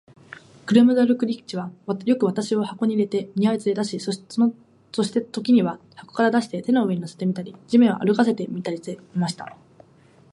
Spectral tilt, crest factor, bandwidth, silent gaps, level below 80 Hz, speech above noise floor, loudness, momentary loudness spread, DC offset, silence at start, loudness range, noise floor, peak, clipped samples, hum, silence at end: -6.5 dB/octave; 18 dB; 11.5 kHz; none; -70 dBFS; 32 dB; -22 LUFS; 13 LU; under 0.1%; 0.65 s; 2 LU; -54 dBFS; -4 dBFS; under 0.1%; none; 0.8 s